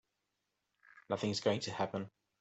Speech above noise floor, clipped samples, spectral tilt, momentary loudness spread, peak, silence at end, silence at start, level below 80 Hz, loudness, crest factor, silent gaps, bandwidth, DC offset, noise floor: 49 dB; under 0.1%; -5 dB/octave; 9 LU; -18 dBFS; 0.3 s; 0.95 s; -78 dBFS; -37 LUFS; 22 dB; none; 8.2 kHz; under 0.1%; -86 dBFS